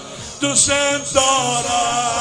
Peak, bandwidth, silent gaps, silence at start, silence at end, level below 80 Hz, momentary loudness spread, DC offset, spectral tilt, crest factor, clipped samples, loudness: 0 dBFS; 10 kHz; none; 0 s; 0 s; -46 dBFS; 5 LU; under 0.1%; -1.5 dB/octave; 18 dB; under 0.1%; -16 LUFS